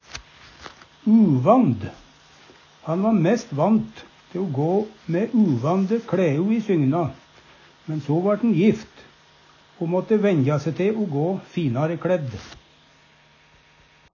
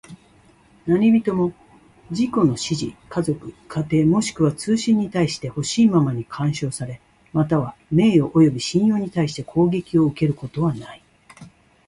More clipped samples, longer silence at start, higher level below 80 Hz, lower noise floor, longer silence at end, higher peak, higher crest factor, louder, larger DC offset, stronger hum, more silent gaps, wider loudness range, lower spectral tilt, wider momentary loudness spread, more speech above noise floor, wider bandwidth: neither; about the same, 0.15 s vs 0.1 s; second, -58 dBFS vs -52 dBFS; about the same, -55 dBFS vs -53 dBFS; first, 1.6 s vs 0.4 s; about the same, -4 dBFS vs -4 dBFS; about the same, 18 dB vs 16 dB; about the same, -21 LUFS vs -20 LUFS; neither; neither; neither; about the same, 3 LU vs 3 LU; first, -8.5 dB/octave vs -6.5 dB/octave; first, 18 LU vs 11 LU; about the same, 35 dB vs 34 dB; second, 7 kHz vs 11.5 kHz